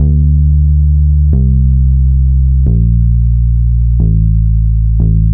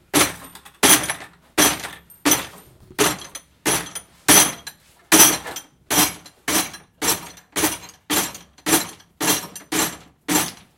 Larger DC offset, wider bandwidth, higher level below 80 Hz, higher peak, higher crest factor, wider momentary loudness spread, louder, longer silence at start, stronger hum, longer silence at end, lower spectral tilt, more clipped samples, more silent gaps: neither; second, 0.8 kHz vs 17 kHz; first, -10 dBFS vs -52 dBFS; about the same, 0 dBFS vs 0 dBFS; second, 8 dB vs 22 dB; second, 2 LU vs 20 LU; first, -11 LUFS vs -18 LUFS; second, 0 s vs 0.15 s; neither; second, 0 s vs 0.25 s; first, -18.5 dB/octave vs -1 dB/octave; neither; neither